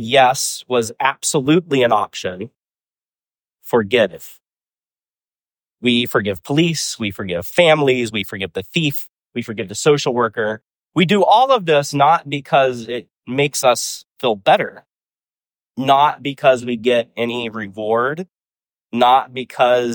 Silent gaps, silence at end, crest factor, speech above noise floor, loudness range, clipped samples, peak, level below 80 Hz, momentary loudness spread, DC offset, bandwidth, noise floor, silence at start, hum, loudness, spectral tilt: 15.46-15.50 s; 0 s; 16 dB; over 73 dB; 5 LU; under 0.1%; -2 dBFS; -60 dBFS; 13 LU; under 0.1%; over 20 kHz; under -90 dBFS; 0 s; none; -17 LUFS; -4 dB/octave